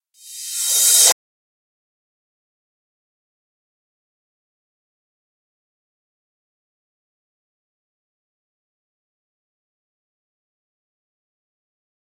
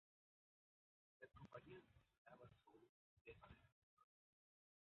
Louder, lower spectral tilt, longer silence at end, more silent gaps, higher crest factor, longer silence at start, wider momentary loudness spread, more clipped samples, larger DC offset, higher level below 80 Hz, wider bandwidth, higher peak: first, -13 LUFS vs -66 LUFS; second, 4 dB/octave vs -5 dB/octave; first, 10.9 s vs 0.9 s; second, none vs 2.18-2.25 s, 2.89-3.25 s, 3.72-3.97 s; about the same, 28 dB vs 24 dB; second, 0.25 s vs 1.2 s; first, 16 LU vs 7 LU; neither; neither; second, -88 dBFS vs -82 dBFS; first, 16.5 kHz vs 4.2 kHz; first, 0 dBFS vs -46 dBFS